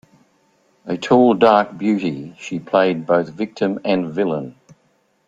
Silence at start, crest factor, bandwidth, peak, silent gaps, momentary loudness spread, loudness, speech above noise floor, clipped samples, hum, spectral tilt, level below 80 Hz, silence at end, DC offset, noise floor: 0.85 s; 18 dB; 7.8 kHz; -2 dBFS; none; 15 LU; -18 LUFS; 44 dB; under 0.1%; none; -6.5 dB/octave; -62 dBFS; 0.75 s; under 0.1%; -62 dBFS